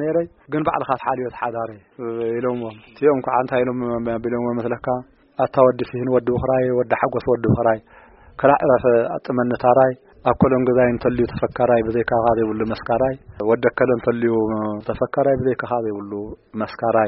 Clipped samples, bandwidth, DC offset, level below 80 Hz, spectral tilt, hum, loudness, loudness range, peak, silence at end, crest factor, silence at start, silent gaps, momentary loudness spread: under 0.1%; 5.8 kHz; under 0.1%; -46 dBFS; -7 dB/octave; none; -20 LUFS; 4 LU; -2 dBFS; 0 s; 18 dB; 0 s; none; 10 LU